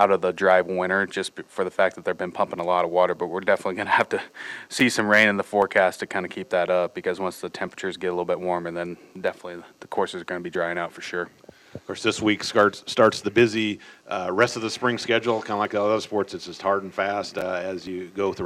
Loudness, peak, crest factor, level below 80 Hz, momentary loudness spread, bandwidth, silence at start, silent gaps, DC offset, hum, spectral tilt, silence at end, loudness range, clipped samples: -24 LUFS; -4 dBFS; 20 dB; -64 dBFS; 12 LU; 15 kHz; 0 s; none; under 0.1%; none; -4.5 dB/octave; 0 s; 7 LU; under 0.1%